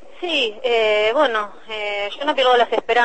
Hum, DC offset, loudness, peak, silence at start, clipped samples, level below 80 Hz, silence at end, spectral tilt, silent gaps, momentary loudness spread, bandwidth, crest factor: none; 1%; -19 LUFS; -4 dBFS; 0.2 s; under 0.1%; -58 dBFS; 0 s; -2 dB/octave; none; 9 LU; 8.6 kHz; 16 dB